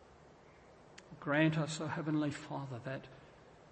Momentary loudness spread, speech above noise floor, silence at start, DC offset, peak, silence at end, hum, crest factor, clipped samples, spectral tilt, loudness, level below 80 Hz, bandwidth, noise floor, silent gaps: 25 LU; 24 dB; 0 s; under 0.1%; -18 dBFS; 0 s; none; 22 dB; under 0.1%; -6 dB/octave; -37 LUFS; -72 dBFS; 8.4 kHz; -60 dBFS; none